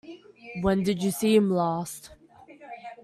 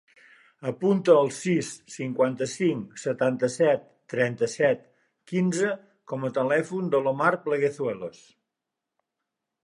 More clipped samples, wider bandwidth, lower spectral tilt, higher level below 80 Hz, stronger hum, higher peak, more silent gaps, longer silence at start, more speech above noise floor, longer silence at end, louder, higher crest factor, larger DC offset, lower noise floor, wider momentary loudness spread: neither; first, 14 kHz vs 11.5 kHz; about the same, -6 dB/octave vs -6 dB/octave; first, -54 dBFS vs -74 dBFS; neither; about the same, -8 dBFS vs -6 dBFS; neither; second, 0.05 s vs 0.6 s; second, 26 dB vs 61 dB; second, 0.1 s vs 1.55 s; about the same, -25 LUFS vs -26 LUFS; about the same, 18 dB vs 20 dB; neither; second, -50 dBFS vs -86 dBFS; first, 22 LU vs 12 LU